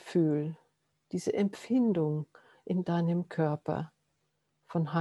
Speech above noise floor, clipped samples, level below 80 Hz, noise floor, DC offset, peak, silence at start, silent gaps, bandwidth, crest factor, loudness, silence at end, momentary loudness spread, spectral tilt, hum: 48 dB; under 0.1%; -74 dBFS; -78 dBFS; under 0.1%; -16 dBFS; 0.05 s; none; 11.5 kHz; 16 dB; -32 LUFS; 0 s; 11 LU; -8 dB/octave; none